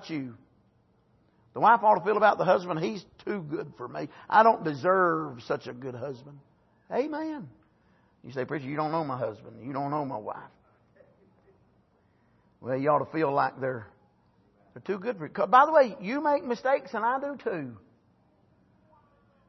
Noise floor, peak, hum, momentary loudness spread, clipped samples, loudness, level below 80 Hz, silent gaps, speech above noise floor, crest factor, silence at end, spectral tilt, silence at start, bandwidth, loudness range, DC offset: -66 dBFS; -6 dBFS; none; 18 LU; under 0.1%; -27 LUFS; -74 dBFS; none; 39 dB; 22 dB; 1.7 s; -7 dB/octave; 0 s; 6.2 kHz; 10 LU; under 0.1%